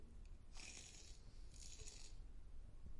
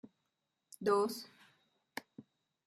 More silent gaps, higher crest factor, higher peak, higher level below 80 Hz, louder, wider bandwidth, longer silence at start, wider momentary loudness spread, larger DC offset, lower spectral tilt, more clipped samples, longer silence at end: neither; second, 14 dB vs 20 dB; second, -40 dBFS vs -20 dBFS; first, -58 dBFS vs -86 dBFS; second, -59 LUFS vs -36 LUFS; second, 11.5 kHz vs 14 kHz; about the same, 0 s vs 0.05 s; second, 8 LU vs 22 LU; neither; second, -2.5 dB/octave vs -4.5 dB/octave; neither; second, 0 s vs 0.45 s